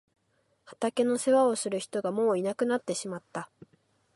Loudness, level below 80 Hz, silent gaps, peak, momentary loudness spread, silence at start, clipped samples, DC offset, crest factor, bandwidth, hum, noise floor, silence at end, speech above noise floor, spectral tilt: -28 LUFS; -78 dBFS; none; -12 dBFS; 14 LU; 0.7 s; under 0.1%; under 0.1%; 16 dB; 11.5 kHz; none; -72 dBFS; 0.7 s; 44 dB; -4.5 dB/octave